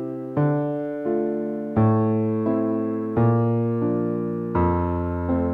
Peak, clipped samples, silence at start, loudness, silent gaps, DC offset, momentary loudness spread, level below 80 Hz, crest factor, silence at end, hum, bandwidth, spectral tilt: -8 dBFS; under 0.1%; 0 s; -23 LUFS; none; under 0.1%; 6 LU; -44 dBFS; 14 dB; 0 s; none; 3.8 kHz; -12 dB/octave